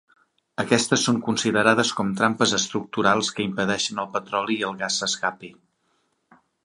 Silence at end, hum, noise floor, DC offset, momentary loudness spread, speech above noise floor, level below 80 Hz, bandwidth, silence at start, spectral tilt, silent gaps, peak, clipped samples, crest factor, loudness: 1.15 s; none; -70 dBFS; under 0.1%; 7 LU; 47 dB; -62 dBFS; 11.5 kHz; 0.6 s; -3 dB/octave; none; -2 dBFS; under 0.1%; 22 dB; -22 LUFS